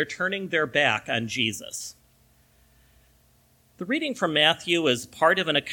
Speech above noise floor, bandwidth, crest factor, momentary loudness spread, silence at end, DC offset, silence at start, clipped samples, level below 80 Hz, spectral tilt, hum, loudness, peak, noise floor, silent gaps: 36 dB; 18.5 kHz; 22 dB; 14 LU; 0 s; under 0.1%; 0 s; under 0.1%; -64 dBFS; -3 dB/octave; none; -24 LUFS; -6 dBFS; -61 dBFS; none